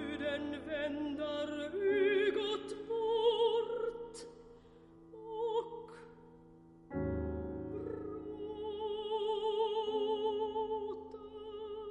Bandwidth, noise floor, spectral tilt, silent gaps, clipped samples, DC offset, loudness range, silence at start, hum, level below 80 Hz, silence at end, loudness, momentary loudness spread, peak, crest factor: 10.5 kHz; -59 dBFS; -6 dB/octave; none; under 0.1%; under 0.1%; 9 LU; 0 s; none; -58 dBFS; 0 s; -37 LUFS; 17 LU; -20 dBFS; 16 dB